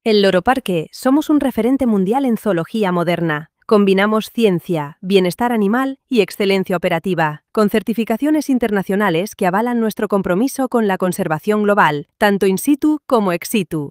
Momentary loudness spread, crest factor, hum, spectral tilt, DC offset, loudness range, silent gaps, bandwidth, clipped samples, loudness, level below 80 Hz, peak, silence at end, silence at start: 5 LU; 16 dB; none; -6 dB/octave; under 0.1%; 1 LU; none; 16.5 kHz; under 0.1%; -17 LUFS; -52 dBFS; 0 dBFS; 0 s; 0.05 s